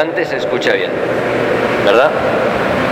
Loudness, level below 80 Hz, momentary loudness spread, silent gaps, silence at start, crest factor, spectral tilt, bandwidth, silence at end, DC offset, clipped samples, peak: -14 LUFS; -44 dBFS; 6 LU; none; 0 s; 14 dB; -5.5 dB/octave; 16 kHz; 0 s; under 0.1%; under 0.1%; 0 dBFS